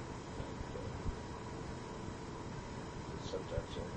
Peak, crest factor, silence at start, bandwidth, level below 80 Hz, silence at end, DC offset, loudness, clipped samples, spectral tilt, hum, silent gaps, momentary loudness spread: -24 dBFS; 20 dB; 0 s; 9.8 kHz; -52 dBFS; 0 s; under 0.1%; -45 LUFS; under 0.1%; -6 dB/octave; none; none; 4 LU